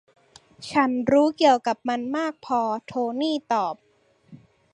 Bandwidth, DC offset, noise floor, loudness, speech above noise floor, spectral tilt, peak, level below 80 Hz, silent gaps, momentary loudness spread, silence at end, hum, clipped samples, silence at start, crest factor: 11 kHz; under 0.1%; -54 dBFS; -23 LUFS; 31 dB; -5 dB/octave; -6 dBFS; -66 dBFS; none; 9 LU; 0.4 s; none; under 0.1%; 0.6 s; 18 dB